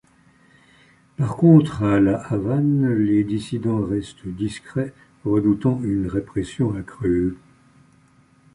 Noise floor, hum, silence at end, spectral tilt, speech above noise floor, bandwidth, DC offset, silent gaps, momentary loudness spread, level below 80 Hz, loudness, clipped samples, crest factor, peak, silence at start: -56 dBFS; none; 1.2 s; -8.5 dB/octave; 36 dB; 11 kHz; under 0.1%; none; 12 LU; -46 dBFS; -21 LUFS; under 0.1%; 18 dB; -2 dBFS; 1.2 s